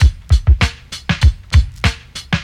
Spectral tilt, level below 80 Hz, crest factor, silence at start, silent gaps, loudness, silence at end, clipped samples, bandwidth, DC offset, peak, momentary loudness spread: -5 dB/octave; -16 dBFS; 12 dB; 0 s; none; -16 LUFS; 0 s; under 0.1%; 10.5 kHz; under 0.1%; -2 dBFS; 8 LU